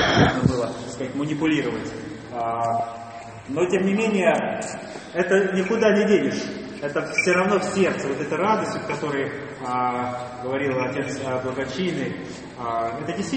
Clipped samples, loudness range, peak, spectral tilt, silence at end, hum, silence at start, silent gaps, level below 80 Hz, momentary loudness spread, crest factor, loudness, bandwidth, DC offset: under 0.1%; 5 LU; -2 dBFS; -5.5 dB/octave; 0 s; none; 0 s; none; -50 dBFS; 13 LU; 20 dB; -23 LUFS; 8.8 kHz; under 0.1%